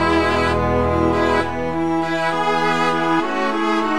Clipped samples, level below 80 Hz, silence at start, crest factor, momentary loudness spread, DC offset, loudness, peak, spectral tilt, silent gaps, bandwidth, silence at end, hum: under 0.1%; -36 dBFS; 0 s; 14 dB; 4 LU; 2%; -18 LUFS; -4 dBFS; -6 dB/octave; none; 12 kHz; 0 s; none